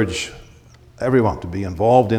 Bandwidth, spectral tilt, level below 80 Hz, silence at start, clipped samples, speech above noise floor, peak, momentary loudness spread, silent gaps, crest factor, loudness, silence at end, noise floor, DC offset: 14.5 kHz; -6 dB/octave; -42 dBFS; 0 s; under 0.1%; 29 dB; 0 dBFS; 11 LU; none; 18 dB; -20 LUFS; 0 s; -46 dBFS; under 0.1%